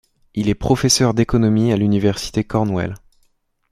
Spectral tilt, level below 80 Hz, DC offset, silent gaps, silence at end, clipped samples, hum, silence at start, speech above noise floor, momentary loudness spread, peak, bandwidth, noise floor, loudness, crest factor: -5 dB/octave; -38 dBFS; under 0.1%; none; 0.75 s; under 0.1%; none; 0.35 s; 46 dB; 10 LU; -2 dBFS; 14.5 kHz; -62 dBFS; -18 LUFS; 16 dB